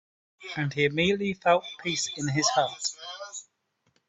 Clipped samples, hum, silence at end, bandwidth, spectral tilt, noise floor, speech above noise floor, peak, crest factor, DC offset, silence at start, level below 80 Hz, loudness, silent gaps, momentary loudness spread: under 0.1%; none; 0.65 s; 8.4 kHz; -3.5 dB/octave; -74 dBFS; 47 dB; -8 dBFS; 20 dB; under 0.1%; 0.4 s; -64 dBFS; -27 LUFS; none; 15 LU